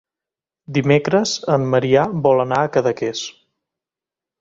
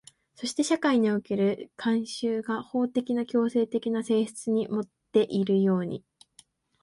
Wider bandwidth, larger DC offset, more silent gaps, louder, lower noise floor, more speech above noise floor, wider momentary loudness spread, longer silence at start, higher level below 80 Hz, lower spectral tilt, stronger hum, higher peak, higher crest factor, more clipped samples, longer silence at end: second, 7.8 kHz vs 11.5 kHz; neither; neither; first, -18 LUFS vs -27 LUFS; first, -88 dBFS vs -60 dBFS; first, 71 dB vs 34 dB; about the same, 8 LU vs 8 LU; first, 0.7 s vs 0.4 s; first, -56 dBFS vs -72 dBFS; about the same, -5.5 dB/octave vs -6 dB/octave; neither; first, -2 dBFS vs -10 dBFS; about the same, 18 dB vs 16 dB; neither; first, 1.1 s vs 0.85 s